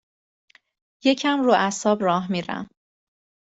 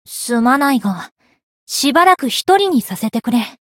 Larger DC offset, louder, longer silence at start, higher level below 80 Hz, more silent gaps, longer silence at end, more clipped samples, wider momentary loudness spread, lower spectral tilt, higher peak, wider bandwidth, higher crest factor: neither; second, -22 LUFS vs -15 LUFS; first, 1.05 s vs 0.1 s; second, -68 dBFS vs -62 dBFS; second, none vs 1.12-1.16 s, 1.43-1.67 s; first, 0.85 s vs 0.15 s; neither; about the same, 13 LU vs 11 LU; about the same, -4.5 dB/octave vs -3.5 dB/octave; second, -6 dBFS vs 0 dBFS; second, 8 kHz vs 17.5 kHz; about the same, 18 dB vs 16 dB